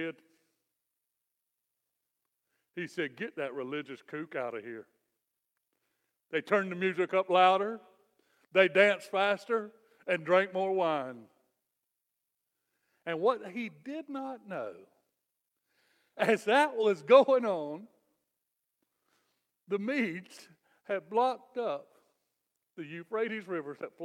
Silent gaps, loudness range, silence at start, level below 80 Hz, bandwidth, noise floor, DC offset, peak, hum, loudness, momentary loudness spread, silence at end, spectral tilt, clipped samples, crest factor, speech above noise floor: none; 12 LU; 0 s; -90 dBFS; 12.5 kHz; -86 dBFS; under 0.1%; -8 dBFS; none; -30 LUFS; 19 LU; 0 s; -5 dB/octave; under 0.1%; 24 dB; 55 dB